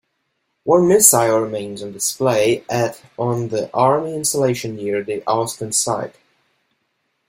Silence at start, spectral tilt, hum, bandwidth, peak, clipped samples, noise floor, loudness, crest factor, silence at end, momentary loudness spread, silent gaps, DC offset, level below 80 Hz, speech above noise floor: 0.65 s; -4 dB/octave; none; 16.5 kHz; 0 dBFS; under 0.1%; -71 dBFS; -17 LUFS; 20 dB; 1.2 s; 14 LU; none; under 0.1%; -60 dBFS; 53 dB